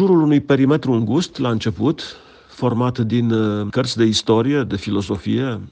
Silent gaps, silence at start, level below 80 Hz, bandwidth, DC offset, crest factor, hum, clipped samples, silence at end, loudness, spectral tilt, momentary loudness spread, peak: none; 0 s; -50 dBFS; 9.6 kHz; under 0.1%; 16 dB; none; under 0.1%; 0 s; -18 LUFS; -6.5 dB/octave; 7 LU; -2 dBFS